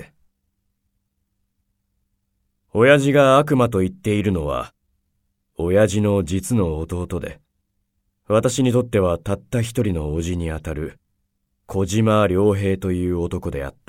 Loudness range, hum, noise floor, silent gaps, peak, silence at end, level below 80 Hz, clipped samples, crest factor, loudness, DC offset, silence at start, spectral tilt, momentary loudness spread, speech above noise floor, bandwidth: 4 LU; none; -72 dBFS; none; -2 dBFS; 0.2 s; -40 dBFS; under 0.1%; 20 dB; -20 LUFS; under 0.1%; 0 s; -6.5 dB/octave; 14 LU; 53 dB; 16 kHz